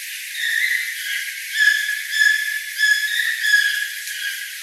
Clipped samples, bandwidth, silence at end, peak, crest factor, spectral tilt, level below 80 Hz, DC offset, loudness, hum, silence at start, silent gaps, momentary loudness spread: under 0.1%; 16 kHz; 0 s; -2 dBFS; 18 dB; 11.5 dB/octave; under -90 dBFS; under 0.1%; -18 LUFS; none; 0 s; none; 9 LU